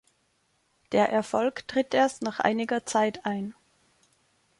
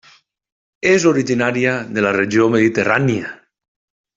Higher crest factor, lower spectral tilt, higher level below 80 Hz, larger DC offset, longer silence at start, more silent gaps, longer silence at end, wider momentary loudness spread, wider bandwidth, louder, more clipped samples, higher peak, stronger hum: about the same, 20 dB vs 16 dB; about the same, -4.5 dB/octave vs -5.5 dB/octave; second, -68 dBFS vs -56 dBFS; neither; about the same, 0.9 s vs 0.85 s; neither; first, 1.1 s vs 0.8 s; about the same, 8 LU vs 6 LU; first, 11.5 kHz vs 7.8 kHz; second, -27 LUFS vs -16 LUFS; neither; second, -8 dBFS vs -2 dBFS; neither